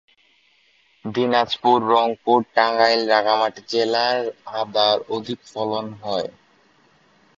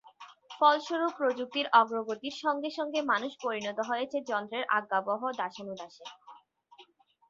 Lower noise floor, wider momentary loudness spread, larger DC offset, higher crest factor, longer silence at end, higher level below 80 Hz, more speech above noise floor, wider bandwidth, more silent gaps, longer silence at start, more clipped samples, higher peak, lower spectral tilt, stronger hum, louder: about the same, -59 dBFS vs -60 dBFS; second, 11 LU vs 17 LU; neither; about the same, 20 dB vs 22 dB; first, 1.1 s vs 0.45 s; first, -66 dBFS vs -82 dBFS; first, 40 dB vs 30 dB; about the same, 7.8 kHz vs 7.6 kHz; neither; first, 1.05 s vs 0.05 s; neither; first, -2 dBFS vs -10 dBFS; about the same, -4.5 dB/octave vs -3.5 dB/octave; neither; first, -20 LUFS vs -30 LUFS